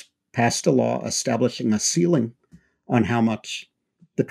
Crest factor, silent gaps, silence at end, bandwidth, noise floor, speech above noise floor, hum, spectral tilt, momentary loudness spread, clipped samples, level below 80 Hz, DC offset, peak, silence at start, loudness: 18 dB; none; 0.05 s; 14.5 kHz; -55 dBFS; 34 dB; none; -4.5 dB/octave; 12 LU; under 0.1%; -62 dBFS; under 0.1%; -4 dBFS; 0.35 s; -22 LUFS